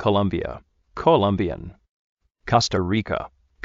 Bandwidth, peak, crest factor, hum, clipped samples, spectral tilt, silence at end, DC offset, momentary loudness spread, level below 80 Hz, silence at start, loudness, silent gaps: 7.6 kHz; -4 dBFS; 20 dB; none; under 0.1%; -5 dB/octave; 0.35 s; under 0.1%; 21 LU; -46 dBFS; 0 s; -22 LUFS; 1.89-2.17 s